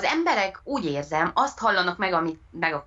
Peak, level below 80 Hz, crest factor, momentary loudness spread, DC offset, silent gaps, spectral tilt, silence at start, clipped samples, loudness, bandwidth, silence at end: -8 dBFS; -56 dBFS; 16 dB; 6 LU; under 0.1%; none; -4.5 dB/octave; 0 s; under 0.1%; -25 LUFS; 8 kHz; 0.05 s